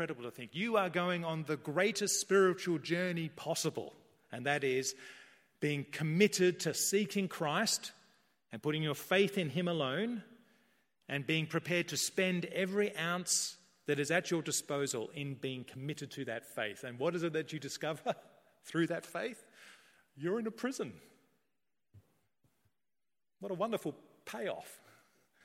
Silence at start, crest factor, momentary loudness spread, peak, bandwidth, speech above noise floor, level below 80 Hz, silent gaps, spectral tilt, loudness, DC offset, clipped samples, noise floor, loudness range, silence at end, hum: 0 s; 24 dB; 13 LU; -12 dBFS; 16.5 kHz; over 55 dB; -82 dBFS; none; -4 dB/octave; -35 LUFS; under 0.1%; under 0.1%; under -90 dBFS; 10 LU; 0.7 s; none